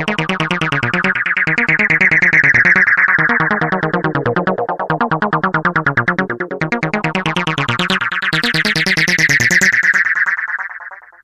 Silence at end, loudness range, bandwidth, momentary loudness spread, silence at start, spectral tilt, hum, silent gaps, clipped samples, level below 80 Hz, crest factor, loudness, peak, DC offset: 0.25 s; 5 LU; 15.5 kHz; 10 LU; 0 s; -4 dB/octave; none; none; under 0.1%; -46 dBFS; 14 dB; -13 LUFS; 0 dBFS; under 0.1%